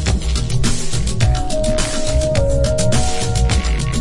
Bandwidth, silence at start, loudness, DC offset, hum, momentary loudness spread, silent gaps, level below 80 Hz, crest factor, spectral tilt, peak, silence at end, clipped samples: 11.5 kHz; 0 s; -18 LUFS; under 0.1%; none; 3 LU; none; -20 dBFS; 12 dB; -4.5 dB/octave; -2 dBFS; 0 s; under 0.1%